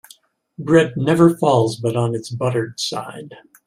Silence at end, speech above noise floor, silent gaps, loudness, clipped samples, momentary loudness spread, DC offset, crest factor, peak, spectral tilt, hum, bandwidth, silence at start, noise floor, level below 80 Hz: 0.25 s; 33 dB; none; -18 LUFS; under 0.1%; 15 LU; under 0.1%; 18 dB; 0 dBFS; -6 dB/octave; none; 14.5 kHz; 0.6 s; -51 dBFS; -58 dBFS